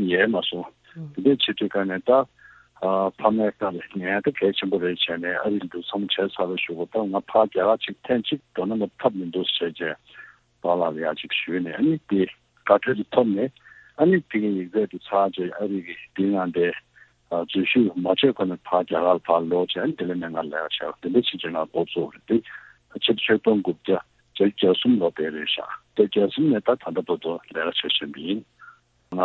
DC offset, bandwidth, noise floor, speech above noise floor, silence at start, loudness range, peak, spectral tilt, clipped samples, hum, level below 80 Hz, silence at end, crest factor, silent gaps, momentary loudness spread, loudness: under 0.1%; 4.4 kHz; -51 dBFS; 28 dB; 0 s; 3 LU; -4 dBFS; -8 dB/octave; under 0.1%; none; -64 dBFS; 0 s; 20 dB; none; 10 LU; -24 LUFS